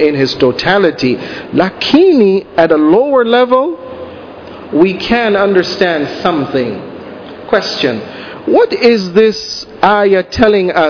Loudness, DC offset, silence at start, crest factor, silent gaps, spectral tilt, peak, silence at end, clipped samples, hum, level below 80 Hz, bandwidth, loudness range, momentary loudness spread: -11 LUFS; under 0.1%; 0 s; 12 dB; none; -6 dB/octave; 0 dBFS; 0 s; 0.7%; none; -42 dBFS; 5.4 kHz; 4 LU; 17 LU